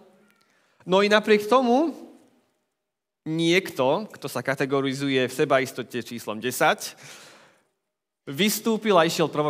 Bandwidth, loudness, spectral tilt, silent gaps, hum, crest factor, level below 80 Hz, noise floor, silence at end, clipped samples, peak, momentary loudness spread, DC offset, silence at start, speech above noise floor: 16 kHz; -23 LUFS; -4.5 dB/octave; none; none; 22 dB; -80 dBFS; -84 dBFS; 0 s; under 0.1%; -2 dBFS; 15 LU; under 0.1%; 0.85 s; 61 dB